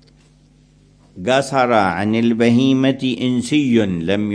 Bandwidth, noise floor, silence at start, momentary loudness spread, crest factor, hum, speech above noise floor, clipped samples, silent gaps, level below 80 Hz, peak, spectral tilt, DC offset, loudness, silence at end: 10.5 kHz; -51 dBFS; 1.15 s; 5 LU; 16 dB; none; 35 dB; under 0.1%; none; -52 dBFS; 0 dBFS; -6 dB/octave; under 0.1%; -16 LUFS; 0 s